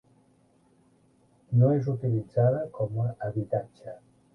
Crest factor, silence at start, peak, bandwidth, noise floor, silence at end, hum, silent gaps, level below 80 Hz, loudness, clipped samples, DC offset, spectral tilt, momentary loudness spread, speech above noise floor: 18 dB; 1.5 s; -10 dBFS; 2.2 kHz; -64 dBFS; 0.35 s; none; none; -62 dBFS; -27 LUFS; under 0.1%; under 0.1%; -11.5 dB/octave; 21 LU; 37 dB